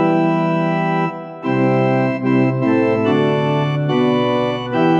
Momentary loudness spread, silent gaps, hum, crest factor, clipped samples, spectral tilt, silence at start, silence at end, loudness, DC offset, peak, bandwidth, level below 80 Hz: 4 LU; none; none; 12 dB; under 0.1%; -8.5 dB/octave; 0 s; 0 s; -17 LUFS; under 0.1%; -4 dBFS; 7.4 kHz; -58 dBFS